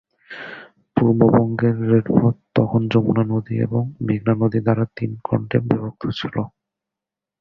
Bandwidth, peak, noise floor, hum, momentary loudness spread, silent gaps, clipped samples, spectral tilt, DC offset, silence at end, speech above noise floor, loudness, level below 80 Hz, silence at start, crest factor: 5.8 kHz; -2 dBFS; -87 dBFS; none; 15 LU; none; under 0.1%; -10 dB/octave; under 0.1%; 0.9 s; 68 dB; -20 LUFS; -50 dBFS; 0.3 s; 18 dB